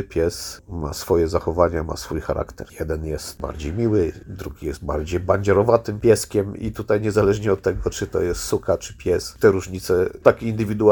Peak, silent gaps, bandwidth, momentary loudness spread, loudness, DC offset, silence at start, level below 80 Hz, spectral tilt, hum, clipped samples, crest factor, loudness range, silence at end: 0 dBFS; none; 19 kHz; 12 LU; -22 LUFS; under 0.1%; 0 s; -38 dBFS; -6 dB/octave; none; under 0.1%; 20 dB; 5 LU; 0 s